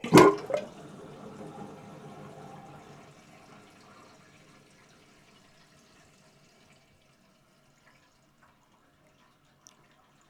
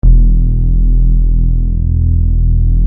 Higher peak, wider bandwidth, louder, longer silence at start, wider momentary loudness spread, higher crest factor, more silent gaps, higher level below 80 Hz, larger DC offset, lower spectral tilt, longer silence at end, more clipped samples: second, -4 dBFS vs 0 dBFS; first, 17 kHz vs 0.7 kHz; second, -24 LUFS vs -14 LUFS; about the same, 0.05 s vs 0.05 s; first, 32 LU vs 3 LU; first, 28 dB vs 8 dB; neither; second, -66 dBFS vs -8 dBFS; neither; second, -5.5 dB/octave vs -16.5 dB/octave; first, 9.65 s vs 0 s; neither